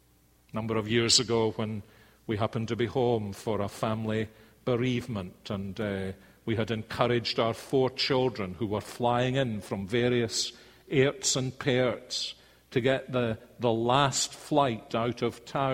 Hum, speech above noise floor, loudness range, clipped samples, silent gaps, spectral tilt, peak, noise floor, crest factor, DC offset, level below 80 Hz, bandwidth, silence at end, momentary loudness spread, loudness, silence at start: none; 34 dB; 4 LU; under 0.1%; none; -4.5 dB/octave; -8 dBFS; -63 dBFS; 20 dB; under 0.1%; -58 dBFS; 16.5 kHz; 0 s; 11 LU; -29 LUFS; 0.55 s